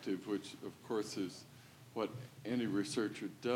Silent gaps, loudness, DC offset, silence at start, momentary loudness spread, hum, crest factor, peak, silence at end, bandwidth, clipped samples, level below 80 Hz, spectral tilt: none; -41 LUFS; under 0.1%; 0 s; 13 LU; none; 16 dB; -24 dBFS; 0 s; 17 kHz; under 0.1%; -86 dBFS; -5 dB/octave